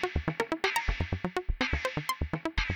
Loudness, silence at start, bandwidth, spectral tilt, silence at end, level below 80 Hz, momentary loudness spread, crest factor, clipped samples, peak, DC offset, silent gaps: -32 LUFS; 0 s; over 20 kHz; -5 dB/octave; 0 s; -38 dBFS; 4 LU; 20 dB; under 0.1%; -12 dBFS; under 0.1%; none